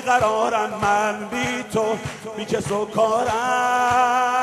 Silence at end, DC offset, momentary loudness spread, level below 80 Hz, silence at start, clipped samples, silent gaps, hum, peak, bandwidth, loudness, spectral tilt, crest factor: 0 s; under 0.1%; 8 LU; -52 dBFS; 0 s; under 0.1%; none; none; -6 dBFS; 13 kHz; -21 LUFS; -4 dB/octave; 16 dB